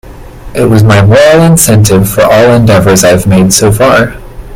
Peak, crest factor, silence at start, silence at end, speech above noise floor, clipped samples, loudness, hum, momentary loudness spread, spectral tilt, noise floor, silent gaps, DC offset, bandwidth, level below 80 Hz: 0 dBFS; 4 dB; 0.05 s; 0 s; 21 dB; 5%; -5 LUFS; none; 5 LU; -5 dB/octave; -25 dBFS; none; under 0.1%; over 20 kHz; -26 dBFS